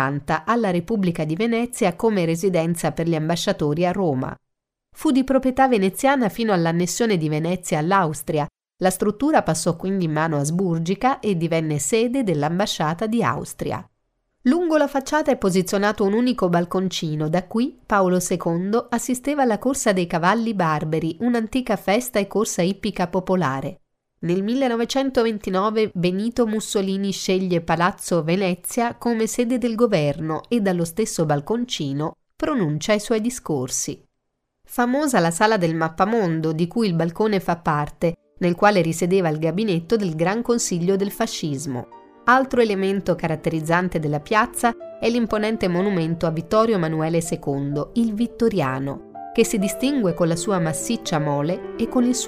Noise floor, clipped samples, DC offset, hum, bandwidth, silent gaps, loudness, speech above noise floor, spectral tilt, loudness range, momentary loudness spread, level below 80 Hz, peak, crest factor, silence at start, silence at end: -75 dBFS; under 0.1%; under 0.1%; none; 15.5 kHz; none; -21 LUFS; 54 dB; -5.5 dB/octave; 2 LU; 6 LU; -50 dBFS; -2 dBFS; 18 dB; 0 s; 0 s